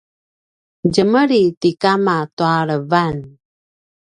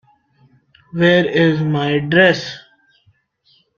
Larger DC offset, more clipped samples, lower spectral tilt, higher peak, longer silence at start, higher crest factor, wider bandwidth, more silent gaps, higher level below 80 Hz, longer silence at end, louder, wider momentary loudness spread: neither; neither; about the same, -6.5 dB/octave vs -6.5 dB/octave; about the same, 0 dBFS vs 0 dBFS; about the same, 0.85 s vs 0.95 s; about the same, 18 dB vs 16 dB; first, 10.5 kHz vs 7.2 kHz; first, 1.57-1.61 s, 2.33-2.37 s vs none; about the same, -54 dBFS vs -56 dBFS; second, 0.85 s vs 1.2 s; about the same, -16 LUFS vs -15 LUFS; second, 6 LU vs 18 LU